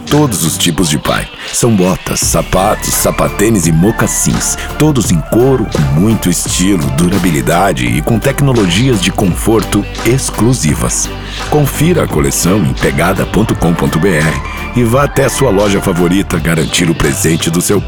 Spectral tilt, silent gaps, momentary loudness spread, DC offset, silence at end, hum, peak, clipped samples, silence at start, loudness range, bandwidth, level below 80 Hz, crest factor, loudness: -4.5 dB/octave; none; 3 LU; 0.6%; 0 s; none; 0 dBFS; under 0.1%; 0 s; 1 LU; over 20 kHz; -24 dBFS; 10 dB; -11 LUFS